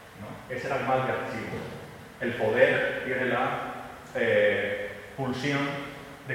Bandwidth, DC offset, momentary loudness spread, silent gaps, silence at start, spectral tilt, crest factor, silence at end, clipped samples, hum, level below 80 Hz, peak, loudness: 16.5 kHz; under 0.1%; 17 LU; none; 0 s; -5.5 dB/octave; 22 dB; 0 s; under 0.1%; none; -60 dBFS; -6 dBFS; -28 LUFS